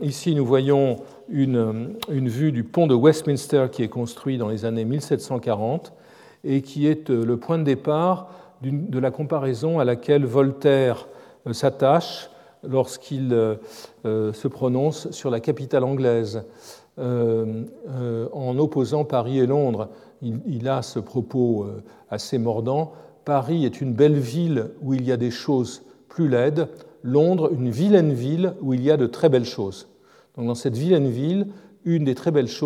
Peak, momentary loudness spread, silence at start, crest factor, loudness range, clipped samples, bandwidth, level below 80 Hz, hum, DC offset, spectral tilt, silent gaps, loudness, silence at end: -4 dBFS; 13 LU; 0 s; 18 dB; 4 LU; under 0.1%; 14.5 kHz; -72 dBFS; none; under 0.1%; -7.5 dB/octave; none; -22 LUFS; 0 s